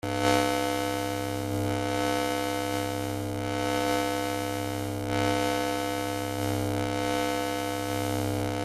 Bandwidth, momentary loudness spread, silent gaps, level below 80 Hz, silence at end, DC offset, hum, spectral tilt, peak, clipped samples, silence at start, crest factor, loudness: 16 kHz; 5 LU; none; -52 dBFS; 0 s; under 0.1%; none; -4.5 dB/octave; -8 dBFS; under 0.1%; 0.05 s; 20 dB; -29 LUFS